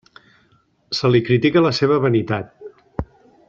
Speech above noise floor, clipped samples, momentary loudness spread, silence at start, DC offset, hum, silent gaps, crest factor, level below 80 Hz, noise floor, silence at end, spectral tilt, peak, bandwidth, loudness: 43 dB; under 0.1%; 16 LU; 0.9 s; under 0.1%; none; none; 16 dB; -46 dBFS; -59 dBFS; 0.45 s; -7 dB/octave; -2 dBFS; 7.6 kHz; -18 LUFS